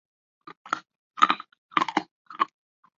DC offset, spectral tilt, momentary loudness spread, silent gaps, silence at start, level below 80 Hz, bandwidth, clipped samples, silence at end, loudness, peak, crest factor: under 0.1%; 0 dB/octave; 21 LU; 0.96-1.11 s, 1.58-1.69 s, 2.11-2.25 s; 0.65 s; -74 dBFS; 7.6 kHz; under 0.1%; 0.5 s; -27 LUFS; -2 dBFS; 28 dB